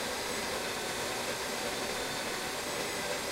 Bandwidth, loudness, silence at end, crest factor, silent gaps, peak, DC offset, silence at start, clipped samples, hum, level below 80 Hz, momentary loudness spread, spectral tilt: 16 kHz; -34 LUFS; 0 s; 14 dB; none; -22 dBFS; under 0.1%; 0 s; under 0.1%; none; -60 dBFS; 1 LU; -1.5 dB/octave